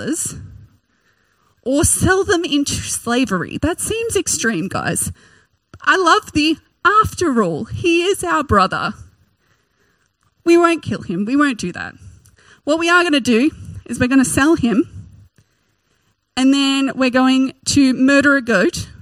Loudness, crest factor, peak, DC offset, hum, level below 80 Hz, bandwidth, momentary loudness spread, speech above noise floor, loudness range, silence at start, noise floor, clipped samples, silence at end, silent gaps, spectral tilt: -16 LUFS; 18 dB; 0 dBFS; under 0.1%; none; -42 dBFS; 16 kHz; 10 LU; 48 dB; 4 LU; 0 s; -64 dBFS; under 0.1%; 0.1 s; none; -4 dB/octave